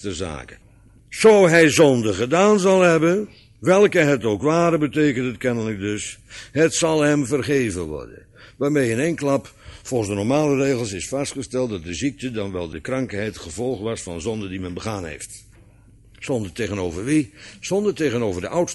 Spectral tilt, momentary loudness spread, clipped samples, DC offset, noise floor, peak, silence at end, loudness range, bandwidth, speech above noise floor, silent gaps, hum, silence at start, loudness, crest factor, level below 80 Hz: -5 dB/octave; 14 LU; under 0.1%; under 0.1%; -50 dBFS; -2 dBFS; 0 s; 11 LU; 12 kHz; 30 dB; none; none; 0 s; -20 LUFS; 18 dB; -48 dBFS